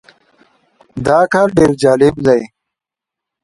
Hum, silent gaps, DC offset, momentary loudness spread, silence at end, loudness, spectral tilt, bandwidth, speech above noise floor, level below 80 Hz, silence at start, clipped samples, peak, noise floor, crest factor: none; none; under 0.1%; 12 LU; 0.95 s; -12 LUFS; -6.5 dB/octave; 11.5 kHz; 73 dB; -42 dBFS; 0.95 s; under 0.1%; 0 dBFS; -84 dBFS; 14 dB